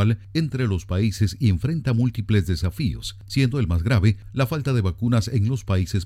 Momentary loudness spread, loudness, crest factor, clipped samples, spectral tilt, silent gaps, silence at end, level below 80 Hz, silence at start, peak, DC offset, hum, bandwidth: 5 LU; -23 LUFS; 16 dB; under 0.1%; -7 dB/octave; none; 0 s; -38 dBFS; 0 s; -6 dBFS; under 0.1%; none; 15 kHz